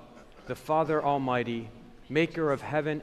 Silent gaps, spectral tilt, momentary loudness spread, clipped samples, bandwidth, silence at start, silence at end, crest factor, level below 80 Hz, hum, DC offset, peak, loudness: none; -7 dB/octave; 12 LU; under 0.1%; 13.5 kHz; 0 s; 0 s; 16 dB; -58 dBFS; none; under 0.1%; -12 dBFS; -29 LUFS